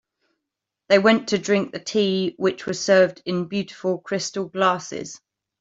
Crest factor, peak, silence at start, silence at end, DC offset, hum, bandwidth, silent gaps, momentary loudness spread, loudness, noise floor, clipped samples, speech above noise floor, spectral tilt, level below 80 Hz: 20 dB; -4 dBFS; 0.9 s; 0.45 s; under 0.1%; none; 8 kHz; none; 10 LU; -21 LUFS; -84 dBFS; under 0.1%; 62 dB; -4.5 dB/octave; -66 dBFS